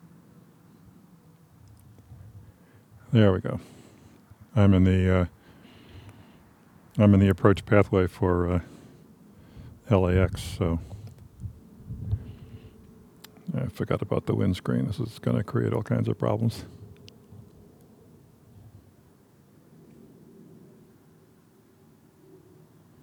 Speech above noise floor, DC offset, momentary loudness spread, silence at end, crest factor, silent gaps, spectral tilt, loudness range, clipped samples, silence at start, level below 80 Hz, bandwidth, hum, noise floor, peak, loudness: 35 dB; under 0.1%; 27 LU; 5.65 s; 24 dB; none; -8 dB/octave; 10 LU; under 0.1%; 2.1 s; -48 dBFS; 13 kHz; none; -58 dBFS; -4 dBFS; -25 LUFS